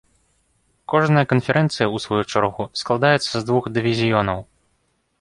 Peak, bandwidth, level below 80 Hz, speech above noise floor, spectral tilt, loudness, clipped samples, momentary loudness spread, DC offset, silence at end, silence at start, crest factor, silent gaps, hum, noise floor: -2 dBFS; 11.5 kHz; -52 dBFS; 48 dB; -6 dB/octave; -20 LUFS; under 0.1%; 6 LU; under 0.1%; 0.75 s; 0.9 s; 18 dB; none; none; -67 dBFS